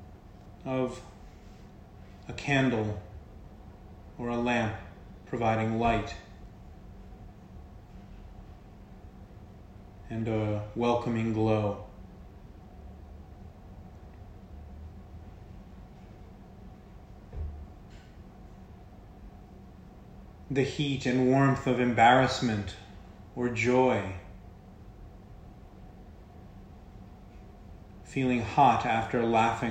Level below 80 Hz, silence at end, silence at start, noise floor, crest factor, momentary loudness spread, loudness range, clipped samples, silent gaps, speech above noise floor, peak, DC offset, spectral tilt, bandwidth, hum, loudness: -50 dBFS; 0 s; 0 s; -50 dBFS; 24 dB; 26 LU; 23 LU; under 0.1%; none; 23 dB; -8 dBFS; under 0.1%; -6.5 dB/octave; 9.2 kHz; none; -28 LUFS